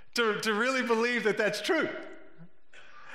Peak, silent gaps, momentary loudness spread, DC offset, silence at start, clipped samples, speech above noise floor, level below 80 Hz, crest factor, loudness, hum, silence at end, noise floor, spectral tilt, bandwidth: -14 dBFS; none; 8 LU; under 0.1%; 0 s; under 0.1%; 28 dB; -78 dBFS; 16 dB; -28 LUFS; none; 0 s; -57 dBFS; -3.5 dB/octave; 16 kHz